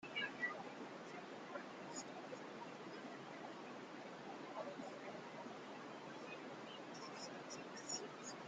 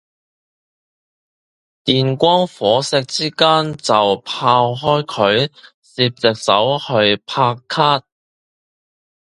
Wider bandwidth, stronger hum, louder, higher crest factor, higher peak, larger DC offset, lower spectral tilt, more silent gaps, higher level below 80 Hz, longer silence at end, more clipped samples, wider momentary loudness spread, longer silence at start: second, 9.4 kHz vs 11.5 kHz; neither; second, -50 LUFS vs -16 LUFS; about the same, 20 dB vs 18 dB; second, -32 dBFS vs 0 dBFS; neither; second, -3 dB/octave vs -4.5 dB/octave; second, none vs 5.74-5.82 s; second, under -90 dBFS vs -58 dBFS; second, 0 s vs 1.35 s; neither; first, 8 LU vs 5 LU; second, 0 s vs 1.85 s